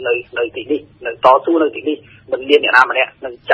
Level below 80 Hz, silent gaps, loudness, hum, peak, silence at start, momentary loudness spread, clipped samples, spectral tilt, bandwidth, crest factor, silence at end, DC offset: -58 dBFS; none; -15 LUFS; none; 0 dBFS; 0 s; 14 LU; 0.2%; -4.5 dB/octave; 9.6 kHz; 16 dB; 0 s; under 0.1%